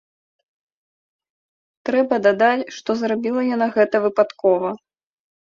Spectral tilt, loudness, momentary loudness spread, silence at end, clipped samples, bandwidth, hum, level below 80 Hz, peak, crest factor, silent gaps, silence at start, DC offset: -5.5 dB/octave; -19 LUFS; 8 LU; 0.75 s; under 0.1%; 7.4 kHz; none; -68 dBFS; -2 dBFS; 18 dB; none; 1.85 s; under 0.1%